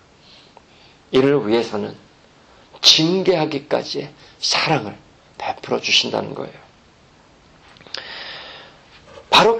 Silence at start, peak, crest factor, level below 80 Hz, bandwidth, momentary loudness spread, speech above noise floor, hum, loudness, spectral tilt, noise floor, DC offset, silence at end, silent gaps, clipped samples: 1.1 s; 0 dBFS; 22 dB; -56 dBFS; 10.5 kHz; 19 LU; 32 dB; none; -18 LUFS; -3.5 dB/octave; -51 dBFS; under 0.1%; 0 s; none; under 0.1%